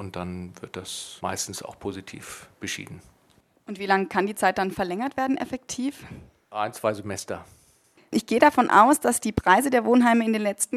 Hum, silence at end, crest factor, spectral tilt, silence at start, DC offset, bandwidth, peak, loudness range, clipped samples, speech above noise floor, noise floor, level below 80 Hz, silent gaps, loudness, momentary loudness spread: none; 0 s; 22 dB; -4 dB/octave; 0 s; under 0.1%; 15 kHz; -2 dBFS; 13 LU; under 0.1%; 38 dB; -62 dBFS; -54 dBFS; none; -23 LUFS; 19 LU